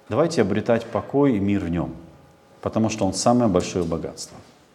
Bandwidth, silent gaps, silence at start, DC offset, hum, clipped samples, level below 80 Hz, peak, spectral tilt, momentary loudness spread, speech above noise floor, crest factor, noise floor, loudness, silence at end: 13 kHz; none; 0.1 s; under 0.1%; none; under 0.1%; -52 dBFS; -4 dBFS; -6 dB/octave; 13 LU; 29 dB; 18 dB; -51 dBFS; -22 LUFS; 0.3 s